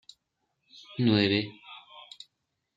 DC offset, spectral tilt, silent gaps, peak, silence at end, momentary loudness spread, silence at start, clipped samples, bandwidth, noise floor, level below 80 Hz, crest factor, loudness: under 0.1%; -7 dB/octave; none; -10 dBFS; 0.75 s; 24 LU; 0.9 s; under 0.1%; 7.8 kHz; -80 dBFS; -72 dBFS; 22 dB; -26 LUFS